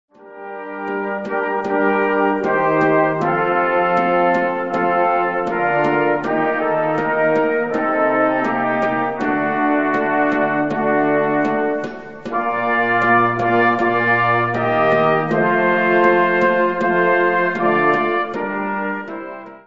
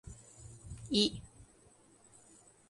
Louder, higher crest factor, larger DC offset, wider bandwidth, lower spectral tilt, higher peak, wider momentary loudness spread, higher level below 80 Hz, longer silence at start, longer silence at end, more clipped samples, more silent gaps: first, -17 LUFS vs -32 LUFS; second, 16 dB vs 26 dB; first, 0.5% vs under 0.1%; second, 7.6 kHz vs 11.5 kHz; first, -7.5 dB/octave vs -4 dB/octave; first, -2 dBFS vs -14 dBFS; second, 8 LU vs 23 LU; about the same, -56 dBFS vs -60 dBFS; first, 0.2 s vs 0.05 s; second, 0.05 s vs 1.25 s; neither; neither